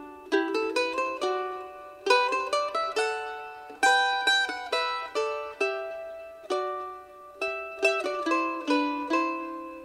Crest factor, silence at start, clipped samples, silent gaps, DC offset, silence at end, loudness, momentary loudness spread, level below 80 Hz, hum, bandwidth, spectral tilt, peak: 20 dB; 0 s; under 0.1%; none; under 0.1%; 0 s; -27 LUFS; 15 LU; -70 dBFS; none; 15 kHz; -1 dB/octave; -8 dBFS